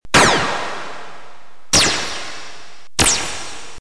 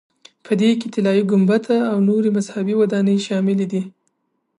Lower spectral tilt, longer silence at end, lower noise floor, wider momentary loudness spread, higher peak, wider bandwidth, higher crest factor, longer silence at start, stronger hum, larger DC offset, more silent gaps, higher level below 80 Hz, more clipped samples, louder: second, -1.5 dB/octave vs -7 dB/octave; second, 0 s vs 0.7 s; second, -46 dBFS vs -71 dBFS; first, 21 LU vs 6 LU; first, 0 dBFS vs -6 dBFS; about the same, 11 kHz vs 10.5 kHz; first, 20 dB vs 12 dB; second, 0 s vs 0.45 s; neither; first, 5% vs under 0.1%; neither; first, -40 dBFS vs -70 dBFS; neither; about the same, -16 LUFS vs -18 LUFS